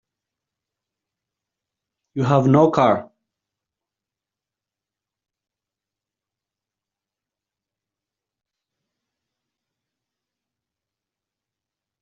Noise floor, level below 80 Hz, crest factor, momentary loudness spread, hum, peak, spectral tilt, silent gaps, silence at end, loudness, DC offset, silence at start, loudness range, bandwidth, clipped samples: -88 dBFS; -64 dBFS; 26 dB; 11 LU; none; -2 dBFS; -7.5 dB/octave; none; 9 s; -17 LUFS; under 0.1%; 2.15 s; 3 LU; 7.2 kHz; under 0.1%